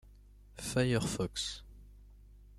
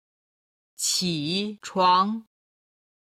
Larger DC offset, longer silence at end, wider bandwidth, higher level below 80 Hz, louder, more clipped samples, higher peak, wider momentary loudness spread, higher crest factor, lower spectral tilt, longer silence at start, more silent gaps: neither; second, 0 s vs 0.8 s; about the same, 15 kHz vs 16 kHz; first, -54 dBFS vs -70 dBFS; second, -34 LUFS vs -24 LUFS; neither; second, -18 dBFS vs -8 dBFS; first, 16 LU vs 9 LU; about the same, 20 dB vs 20 dB; first, -4.5 dB/octave vs -3 dB/octave; second, 0.05 s vs 0.8 s; neither